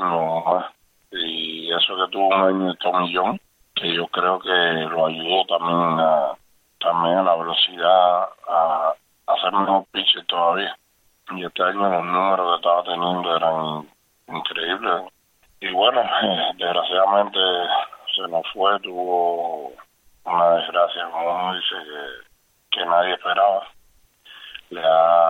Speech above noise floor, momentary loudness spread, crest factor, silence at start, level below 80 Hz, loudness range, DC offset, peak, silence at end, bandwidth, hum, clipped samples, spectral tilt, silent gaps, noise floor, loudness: 36 dB; 11 LU; 18 dB; 0 s; -68 dBFS; 4 LU; under 0.1%; -4 dBFS; 0 s; 6.4 kHz; none; under 0.1%; -5.5 dB/octave; none; -56 dBFS; -20 LUFS